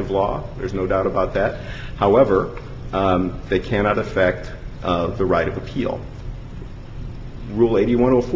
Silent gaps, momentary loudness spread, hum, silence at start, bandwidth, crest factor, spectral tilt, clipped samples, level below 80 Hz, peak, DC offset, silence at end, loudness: none; 18 LU; none; 0 s; 7.6 kHz; 18 dB; -8 dB/octave; under 0.1%; -34 dBFS; -2 dBFS; under 0.1%; 0 s; -20 LUFS